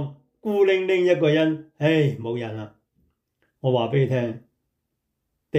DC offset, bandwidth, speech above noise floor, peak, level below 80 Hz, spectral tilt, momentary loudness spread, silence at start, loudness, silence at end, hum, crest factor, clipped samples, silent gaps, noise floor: under 0.1%; 8.2 kHz; 57 dB; -8 dBFS; -68 dBFS; -7.5 dB/octave; 15 LU; 0 s; -22 LUFS; 0 s; none; 16 dB; under 0.1%; none; -78 dBFS